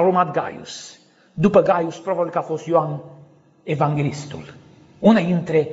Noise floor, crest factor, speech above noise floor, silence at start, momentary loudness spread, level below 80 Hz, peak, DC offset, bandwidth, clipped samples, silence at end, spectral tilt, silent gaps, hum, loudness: -49 dBFS; 18 dB; 30 dB; 0 s; 19 LU; -58 dBFS; -2 dBFS; under 0.1%; 8 kHz; under 0.1%; 0 s; -6.5 dB/octave; none; none; -20 LUFS